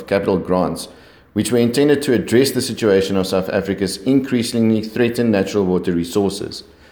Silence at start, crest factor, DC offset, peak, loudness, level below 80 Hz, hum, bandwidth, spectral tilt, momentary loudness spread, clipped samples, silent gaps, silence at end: 0 s; 16 dB; under 0.1%; -2 dBFS; -18 LUFS; -50 dBFS; none; over 20 kHz; -5.5 dB/octave; 8 LU; under 0.1%; none; 0.3 s